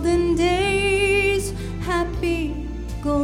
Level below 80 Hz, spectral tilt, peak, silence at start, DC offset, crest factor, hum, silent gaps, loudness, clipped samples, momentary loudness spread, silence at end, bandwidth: -32 dBFS; -5 dB/octave; -8 dBFS; 0 s; under 0.1%; 12 dB; none; none; -21 LUFS; under 0.1%; 11 LU; 0 s; 16 kHz